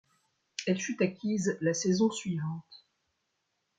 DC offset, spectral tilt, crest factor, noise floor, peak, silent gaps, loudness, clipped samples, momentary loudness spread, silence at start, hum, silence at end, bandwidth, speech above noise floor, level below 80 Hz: under 0.1%; -5 dB/octave; 20 dB; -80 dBFS; -14 dBFS; none; -31 LUFS; under 0.1%; 10 LU; 0.6 s; none; 1 s; 9.4 kHz; 50 dB; -74 dBFS